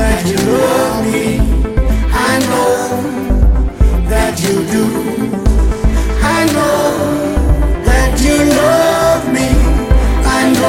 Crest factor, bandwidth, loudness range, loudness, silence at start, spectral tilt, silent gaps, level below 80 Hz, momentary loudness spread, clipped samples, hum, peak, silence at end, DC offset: 10 dB; 16.5 kHz; 2 LU; -13 LUFS; 0 s; -5.5 dB/octave; none; -14 dBFS; 5 LU; under 0.1%; none; 0 dBFS; 0 s; under 0.1%